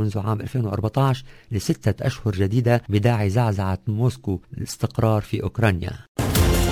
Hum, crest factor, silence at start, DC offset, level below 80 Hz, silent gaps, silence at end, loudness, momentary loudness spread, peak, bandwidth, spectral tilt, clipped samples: none; 16 dB; 0 s; under 0.1%; -32 dBFS; 6.08-6.15 s; 0 s; -23 LUFS; 9 LU; -6 dBFS; 16 kHz; -6.5 dB/octave; under 0.1%